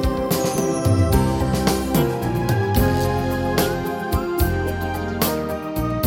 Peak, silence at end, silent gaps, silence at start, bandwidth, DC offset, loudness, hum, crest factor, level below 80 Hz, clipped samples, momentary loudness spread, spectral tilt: -2 dBFS; 0 s; none; 0 s; 17 kHz; under 0.1%; -21 LUFS; none; 18 dB; -30 dBFS; under 0.1%; 6 LU; -6 dB/octave